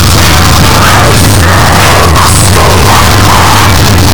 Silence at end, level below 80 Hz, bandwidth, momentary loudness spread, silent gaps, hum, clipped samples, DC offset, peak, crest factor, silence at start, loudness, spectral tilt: 0 s; -14 dBFS; over 20 kHz; 1 LU; none; none; 10%; 20%; 0 dBFS; 6 dB; 0 s; -3 LUFS; -4 dB/octave